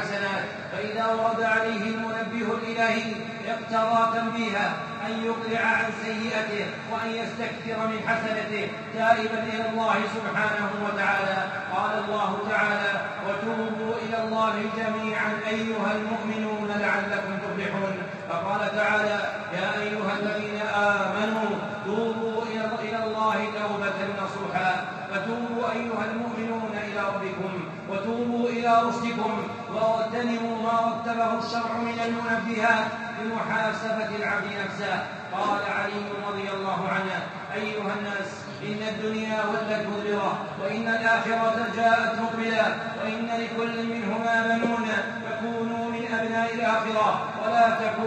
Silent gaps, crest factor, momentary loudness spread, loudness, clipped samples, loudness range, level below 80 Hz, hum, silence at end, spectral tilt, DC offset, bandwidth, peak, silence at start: none; 20 dB; 7 LU; -26 LUFS; under 0.1%; 3 LU; -70 dBFS; none; 0 s; -5 dB/octave; under 0.1%; 8.4 kHz; -8 dBFS; 0 s